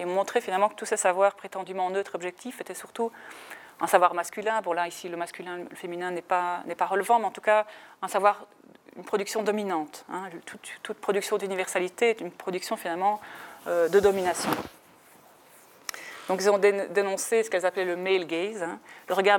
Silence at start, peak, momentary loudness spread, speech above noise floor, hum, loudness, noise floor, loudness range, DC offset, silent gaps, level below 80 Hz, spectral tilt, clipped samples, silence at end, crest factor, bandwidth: 0 s; -4 dBFS; 15 LU; 28 dB; none; -27 LUFS; -55 dBFS; 3 LU; under 0.1%; none; -70 dBFS; -3.5 dB/octave; under 0.1%; 0 s; 22 dB; 17.5 kHz